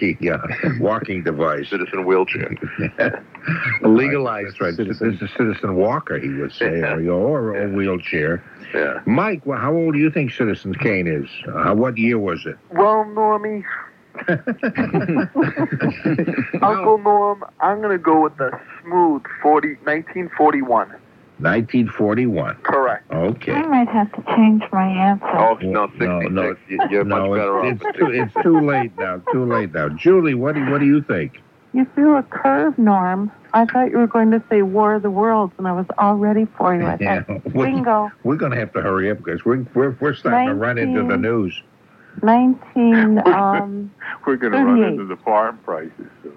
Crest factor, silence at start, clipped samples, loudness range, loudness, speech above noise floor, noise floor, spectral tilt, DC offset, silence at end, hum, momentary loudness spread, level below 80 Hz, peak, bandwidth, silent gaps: 16 dB; 0 s; under 0.1%; 4 LU; -18 LUFS; 22 dB; -39 dBFS; -9.5 dB/octave; under 0.1%; 0.05 s; none; 9 LU; -56 dBFS; -2 dBFS; 5.8 kHz; none